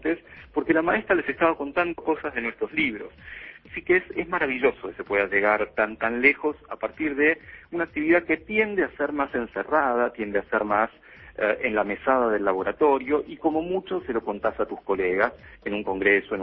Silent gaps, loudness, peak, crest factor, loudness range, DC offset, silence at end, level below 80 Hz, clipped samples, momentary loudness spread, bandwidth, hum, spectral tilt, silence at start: none; -24 LUFS; -6 dBFS; 20 dB; 3 LU; under 0.1%; 0 s; -54 dBFS; under 0.1%; 10 LU; 5.2 kHz; none; -9 dB/octave; 0.05 s